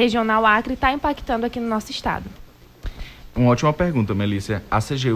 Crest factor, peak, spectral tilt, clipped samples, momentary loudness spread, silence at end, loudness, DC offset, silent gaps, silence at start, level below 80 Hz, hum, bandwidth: 18 dB; -4 dBFS; -6 dB/octave; under 0.1%; 19 LU; 0 s; -21 LUFS; under 0.1%; none; 0 s; -38 dBFS; none; 16 kHz